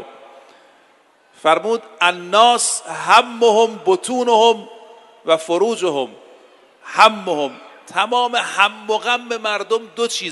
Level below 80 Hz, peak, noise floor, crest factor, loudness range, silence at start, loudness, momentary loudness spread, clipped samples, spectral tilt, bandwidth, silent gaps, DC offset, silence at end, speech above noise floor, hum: -68 dBFS; 0 dBFS; -54 dBFS; 18 dB; 4 LU; 0 s; -16 LUFS; 10 LU; under 0.1%; -1.5 dB/octave; 12 kHz; none; under 0.1%; 0 s; 37 dB; none